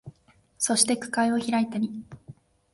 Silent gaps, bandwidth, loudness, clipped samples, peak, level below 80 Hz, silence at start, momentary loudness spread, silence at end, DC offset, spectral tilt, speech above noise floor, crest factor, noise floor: none; 11.5 kHz; -25 LUFS; under 0.1%; -6 dBFS; -66 dBFS; 0.05 s; 13 LU; 0.4 s; under 0.1%; -2.5 dB/octave; 36 dB; 22 dB; -61 dBFS